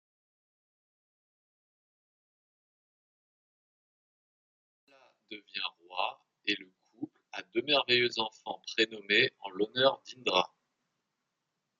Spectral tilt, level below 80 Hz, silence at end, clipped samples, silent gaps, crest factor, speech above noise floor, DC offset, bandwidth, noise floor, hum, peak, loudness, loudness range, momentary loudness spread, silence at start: -3.5 dB/octave; -86 dBFS; 1.35 s; under 0.1%; none; 26 dB; 53 dB; under 0.1%; 7.6 kHz; -85 dBFS; none; -10 dBFS; -31 LUFS; 13 LU; 18 LU; 5.3 s